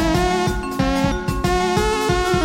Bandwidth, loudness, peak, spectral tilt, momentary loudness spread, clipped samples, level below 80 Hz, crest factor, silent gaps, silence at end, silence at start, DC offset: 16.5 kHz; -19 LUFS; -4 dBFS; -5 dB/octave; 3 LU; under 0.1%; -28 dBFS; 14 dB; none; 0 s; 0 s; under 0.1%